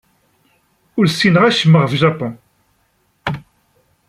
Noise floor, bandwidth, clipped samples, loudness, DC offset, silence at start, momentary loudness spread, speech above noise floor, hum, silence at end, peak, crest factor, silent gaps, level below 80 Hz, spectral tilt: -61 dBFS; 12.5 kHz; under 0.1%; -14 LUFS; under 0.1%; 0.95 s; 15 LU; 49 dB; none; 0.7 s; -2 dBFS; 16 dB; none; -54 dBFS; -6 dB/octave